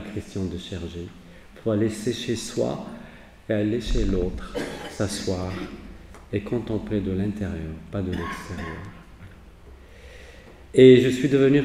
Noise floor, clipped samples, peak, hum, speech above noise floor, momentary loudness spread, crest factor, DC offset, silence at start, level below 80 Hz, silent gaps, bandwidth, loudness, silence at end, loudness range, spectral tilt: -46 dBFS; under 0.1%; -2 dBFS; none; 23 dB; 21 LU; 22 dB; under 0.1%; 0 s; -38 dBFS; none; 13 kHz; -24 LUFS; 0 s; 10 LU; -6.5 dB/octave